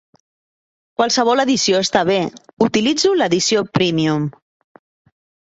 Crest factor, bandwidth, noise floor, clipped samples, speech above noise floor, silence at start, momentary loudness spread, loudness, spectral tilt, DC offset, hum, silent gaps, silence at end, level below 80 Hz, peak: 16 dB; 8.2 kHz; under -90 dBFS; under 0.1%; over 74 dB; 1 s; 6 LU; -16 LUFS; -4 dB/octave; under 0.1%; none; 2.53-2.57 s; 1.1 s; -56 dBFS; -2 dBFS